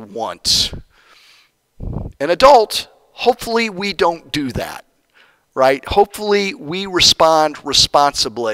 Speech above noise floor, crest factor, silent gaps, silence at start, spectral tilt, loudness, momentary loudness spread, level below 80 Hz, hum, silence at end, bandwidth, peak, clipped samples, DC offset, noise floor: 38 dB; 16 dB; none; 0 s; -2.5 dB/octave; -15 LUFS; 19 LU; -38 dBFS; none; 0 s; 16 kHz; 0 dBFS; under 0.1%; under 0.1%; -53 dBFS